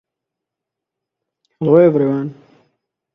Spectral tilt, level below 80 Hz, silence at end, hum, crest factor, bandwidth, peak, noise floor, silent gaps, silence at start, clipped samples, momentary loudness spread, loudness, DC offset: -11 dB/octave; -64 dBFS; 0.8 s; none; 18 dB; 3.8 kHz; 0 dBFS; -83 dBFS; none; 1.6 s; under 0.1%; 13 LU; -14 LUFS; under 0.1%